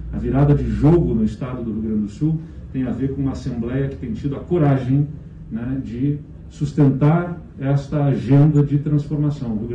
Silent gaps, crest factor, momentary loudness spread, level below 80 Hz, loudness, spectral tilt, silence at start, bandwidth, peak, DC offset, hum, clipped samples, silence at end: none; 12 dB; 12 LU; -36 dBFS; -20 LUFS; -10 dB/octave; 0 s; 7.4 kHz; -6 dBFS; under 0.1%; none; under 0.1%; 0 s